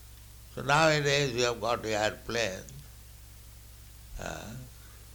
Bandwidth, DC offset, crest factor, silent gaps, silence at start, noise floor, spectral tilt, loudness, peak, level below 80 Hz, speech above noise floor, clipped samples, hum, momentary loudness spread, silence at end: 19.5 kHz; under 0.1%; 22 dB; none; 0 s; -50 dBFS; -3.5 dB/octave; -28 LUFS; -10 dBFS; -50 dBFS; 21 dB; under 0.1%; none; 26 LU; 0 s